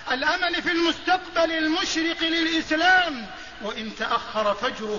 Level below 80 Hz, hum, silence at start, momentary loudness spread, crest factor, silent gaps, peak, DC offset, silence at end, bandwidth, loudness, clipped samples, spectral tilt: -54 dBFS; none; 0 s; 13 LU; 16 dB; none; -8 dBFS; 0.4%; 0 s; 7.4 kHz; -23 LUFS; under 0.1%; -2.5 dB/octave